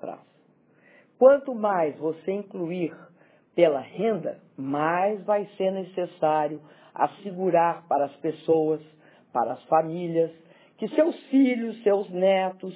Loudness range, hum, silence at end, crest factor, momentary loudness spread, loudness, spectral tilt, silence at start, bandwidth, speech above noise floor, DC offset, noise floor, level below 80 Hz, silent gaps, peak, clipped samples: 3 LU; none; 0 s; 20 dB; 10 LU; -25 LUFS; -10.5 dB/octave; 0.05 s; 4 kHz; 37 dB; under 0.1%; -61 dBFS; -80 dBFS; none; -4 dBFS; under 0.1%